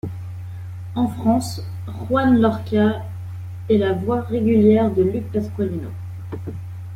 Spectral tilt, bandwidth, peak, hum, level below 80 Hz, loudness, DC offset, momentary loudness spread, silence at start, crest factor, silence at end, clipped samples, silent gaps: -7.5 dB/octave; 15 kHz; -4 dBFS; none; -50 dBFS; -20 LUFS; under 0.1%; 17 LU; 0.05 s; 16 dB; 0 s; under 0.1%; none